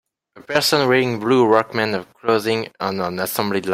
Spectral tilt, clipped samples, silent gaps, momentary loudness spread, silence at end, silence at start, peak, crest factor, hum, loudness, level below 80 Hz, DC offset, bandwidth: -4.5 dB/octave; under 0.1%; none; 8 LU; 0 s; 0.35 s; -2 dBFS; 18 dB; none; -19 LUFS; -62 dBFS; under 0.1%; 16.5 kHz